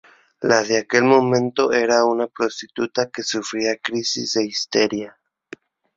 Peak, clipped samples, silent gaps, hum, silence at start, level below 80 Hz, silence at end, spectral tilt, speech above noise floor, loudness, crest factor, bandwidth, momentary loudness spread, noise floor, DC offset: -2 dBFS; under 0.1%; none; none; 0.4 s; -62 dBFS; 0.9 s; -3.5 dB/octave; 24 dB; -20 LUFS; 20 dB; 7.8 kHz; 9 LU; -43 dBFS; under 0.1%